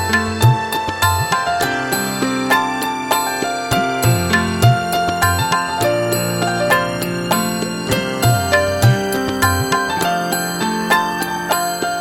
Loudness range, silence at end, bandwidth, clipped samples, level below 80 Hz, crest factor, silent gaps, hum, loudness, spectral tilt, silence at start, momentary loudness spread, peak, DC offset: 1 LU; 0 s; 17 kHz; under 0.1%; -42 dBFS; 16 dB; none; none; -17 LUFS; -4.5 dB/octave; 0 s; 5 LU; 0 dBFS; under 0.1%